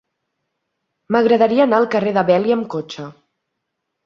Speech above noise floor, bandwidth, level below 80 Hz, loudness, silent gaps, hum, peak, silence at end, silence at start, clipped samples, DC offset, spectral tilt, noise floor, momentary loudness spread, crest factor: 61 dB; 7 kHz; -62 dBFS; -16 LUFS; none; none; -2 dBFS; 0.95 s; 1.1 s; under 0.1%; under 0.1%; -7 dB/octave; -76 dBFS; 17 LU; 18 dB